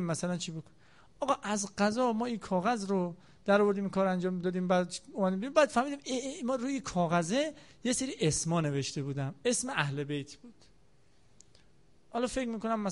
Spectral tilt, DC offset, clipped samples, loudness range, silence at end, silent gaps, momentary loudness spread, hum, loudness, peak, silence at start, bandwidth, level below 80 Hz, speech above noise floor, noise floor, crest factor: -5 dB/octave; under 0.1%; under 0.1%; 6 LU; 0 s; none; 9 LU; none; -32 LUFS; -12 dBFS; 0 s; 11.5 kHz; -62 dBFS; 35 dB; -67 dBFS; 20 dB